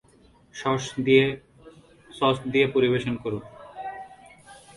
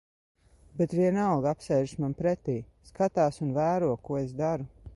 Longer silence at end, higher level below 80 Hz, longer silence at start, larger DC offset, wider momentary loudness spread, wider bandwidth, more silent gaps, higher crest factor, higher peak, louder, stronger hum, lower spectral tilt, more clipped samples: first, 0.25 s vs 0.05 s; about the same, -58 dBFS vs -56 dBFS; second, 0.55 s vs 0.75 s; neither; first, 21 LU vs 8 LU; about the same, 11.5 kHz vs 11.5 kHz; neither; first, 22 dB vs 16 dB; first, -6 dBFS vs -14 dBFS; first, -24 LUFS vs -29 LUFS; neither; second, -5.5 dB/octave vs -8 dB/octave; neither